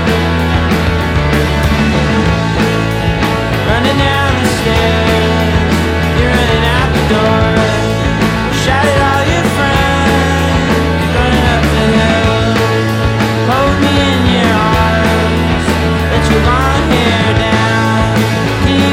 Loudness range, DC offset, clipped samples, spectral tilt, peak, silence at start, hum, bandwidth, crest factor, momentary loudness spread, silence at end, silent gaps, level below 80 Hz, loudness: 1 LU; under 0.1%; under 0.1%; -5.5 dB/octave; 0 dBFS; 0 s; none; 16.5 kHz; 10 dB; 2 LU; 0 s; none; -20 dBFS; -11 LUFS